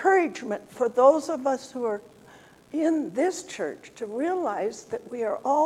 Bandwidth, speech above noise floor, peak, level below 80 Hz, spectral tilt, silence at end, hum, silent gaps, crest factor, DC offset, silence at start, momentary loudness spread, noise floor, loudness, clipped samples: 13.5 kHz; 26 dB; -6 dBFS; -72 dBFS; -4.5 dB/octave; 0 s; none; none; 20 dB; under 0.1%; 0 s; 15 LU; -52 dBFS; -26 LUFS; under 0.1%